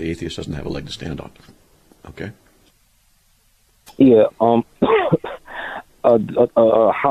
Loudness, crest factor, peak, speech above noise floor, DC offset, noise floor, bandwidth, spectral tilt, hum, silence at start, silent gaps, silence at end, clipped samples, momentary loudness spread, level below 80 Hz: -17 LUFS; 16 dB; -2 dBFS; 41 dB; under 0.1%; -58 dBFS; 13.5 kHz; -7 dB/octave; none; 0 s; none; 0 s; under 0.1%; 19 LU; -46 dBFS